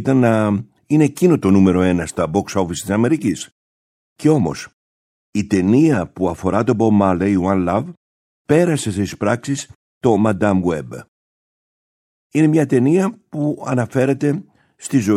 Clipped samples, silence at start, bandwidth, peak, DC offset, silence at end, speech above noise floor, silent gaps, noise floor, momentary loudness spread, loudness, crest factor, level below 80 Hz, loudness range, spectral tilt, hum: under 0.1%; 0 s; 15 kHz; -2 dBFS; under 0.1%; 0 s; over 74 dB; 3.52-4.16 s, 4.73-5.33 s, 7.97-8.45 s, 9.75-10.01 s, 11.08-12.30 s; under -90 dBFS; 11 LU; -17 LUFS; 16 dB; -50 dBFS; 4 LU; -7 dB/octave; none